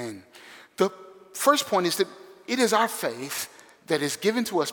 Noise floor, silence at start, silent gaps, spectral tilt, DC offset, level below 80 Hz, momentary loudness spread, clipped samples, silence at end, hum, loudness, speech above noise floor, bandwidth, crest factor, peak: -49 dBFS; 0 s; none; -3 dB/octave; under 0.1%; -76 dBFS; 18 LU; under 0.1%; 0 s; none; -25 LUFS; 24 dB; over 20 kHz; 20 dB; -6 dBFS